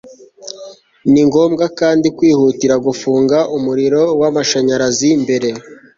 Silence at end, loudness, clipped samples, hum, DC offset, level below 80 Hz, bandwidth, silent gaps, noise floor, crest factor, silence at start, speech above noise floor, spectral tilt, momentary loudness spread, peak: 0.25 s; -13 LUFS; under 0.1%; none; under 0.1%; -52 dBFS; 7.6 kHz; none; -36 dBFS; 12 dB; 0.05 s; 23 dB; -5 dB/octave; 16 LU; -2 dBFS